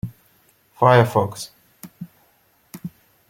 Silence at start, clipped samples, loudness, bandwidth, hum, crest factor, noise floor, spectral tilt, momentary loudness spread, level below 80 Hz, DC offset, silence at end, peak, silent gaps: 0.05 s; under 0.1%; -17 LUFS; 17 kHz; none; 22 dB; -60 dBFS; -6 dB/octave; 25 LU; -56 dBFS; under 0.1%; 0.4 s; -2 dBFS; none